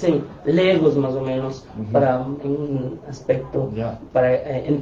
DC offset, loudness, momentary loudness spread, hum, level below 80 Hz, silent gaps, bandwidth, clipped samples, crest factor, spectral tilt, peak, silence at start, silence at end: under 0.1%; -21 LUFS; 11 LU; none; -48 dBFS; none; 7.6 kHz; under 0.1%; 16 dB; -8 dB/octave; -4 dBFS; 0 s; 0 s